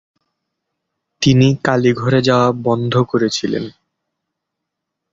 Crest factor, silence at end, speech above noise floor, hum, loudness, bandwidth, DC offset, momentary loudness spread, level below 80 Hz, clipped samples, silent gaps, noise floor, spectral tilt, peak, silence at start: 16 dB; 1.4 s; 64 dB; none; -15 LUFS; 7.8 kHz; under 0.1%; 8 LU; -50 dBFS; under 0.1%; none; -79 dBFS; -6 dB/octave; -2 dBFS; 1.2 s